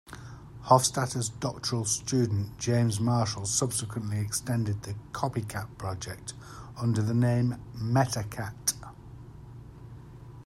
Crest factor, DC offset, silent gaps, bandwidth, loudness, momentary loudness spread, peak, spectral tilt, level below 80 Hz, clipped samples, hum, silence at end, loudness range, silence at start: 24 dB; under 0.1%; none; 14 kHz; -29 LUFS; 21 LU; -6 dBFS; -5 dB/octave; -54 dBFS; under 0.1%; none; 0 s; 5 LU; 0.05 s